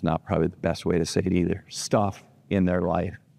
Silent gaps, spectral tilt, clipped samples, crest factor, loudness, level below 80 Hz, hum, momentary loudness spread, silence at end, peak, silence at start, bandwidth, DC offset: none; -6 dB/octave; under 0.1%; 18 dB; -26 LUFS; -48 dBFS; none; 5 LU; 0.2 s; -8 dBFS; 0 s; 13.5 kHz; under 0.1%